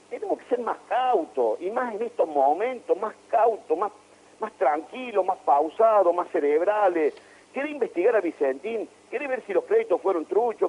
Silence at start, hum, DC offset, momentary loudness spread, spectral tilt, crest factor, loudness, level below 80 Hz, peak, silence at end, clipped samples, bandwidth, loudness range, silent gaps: 0.1 s; none; under 0.1%; 9 LU; -5 dB/octave; 16 dB; -25 LUFS; -78 dBFS; -10 dBFS; 0 s; under 0.1%; 11 kHz; 3 LU; none